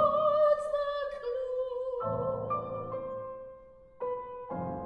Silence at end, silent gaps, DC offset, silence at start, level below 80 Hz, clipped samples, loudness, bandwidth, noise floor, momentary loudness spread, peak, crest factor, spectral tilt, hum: 0 s; none; under 0.1%; 0 s; -62 dBFS; under 0.1%; -32 LUFS; 9.8 kHz; -53 dBFS; 14 LU; -16 dBFS; 16 dB; -7.5 dB/octave; none